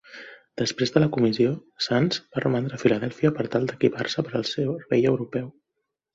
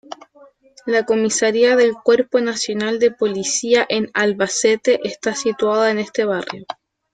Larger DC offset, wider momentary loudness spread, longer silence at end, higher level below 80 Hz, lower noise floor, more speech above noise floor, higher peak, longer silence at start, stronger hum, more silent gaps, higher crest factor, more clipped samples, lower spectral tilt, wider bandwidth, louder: neither; second, 9 LU vs 12 LU; first, 0.65 s vs 0.4 s; about the same, -60 dBFS vs -64 dBFS; first, -81 dBFS vs -49 dBFS; first, 57 dB vs 32 dB; about the same, -4 dBFS vs -2 dBFS; about the same, 0.1 s vs 0.1 s; neither; neither; first, 22 dB vs 16 dB; neither; first, -6 dB/octave vs -3 dB/octave; second, 7.8 kHz vs 9.4 kHz; second, -24 LUFS vs -17 LUFS